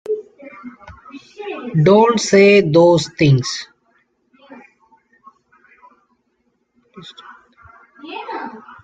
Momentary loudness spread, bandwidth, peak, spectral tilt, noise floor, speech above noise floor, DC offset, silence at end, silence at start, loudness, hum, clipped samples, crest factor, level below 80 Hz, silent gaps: 27 LU; 9.2 kHz; -2 dBFS; -6 dB/octave; -66 dBFS; 54 dB; under 0.1%; 0.25 s; 0.1 s; -14 LUFS; none; under 0.1%; 16 dB; -56 dBFS; none